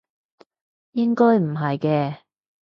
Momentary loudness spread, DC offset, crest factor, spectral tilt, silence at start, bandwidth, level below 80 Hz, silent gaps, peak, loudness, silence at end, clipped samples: 13 LU; under 0.1%; 16 dB; -9.5 dB/octave; 0.95 s; 5.8 kHz; -68 dBFS; none; -6 dBFS; -21 LUFS; 0.45 s; under 0.1%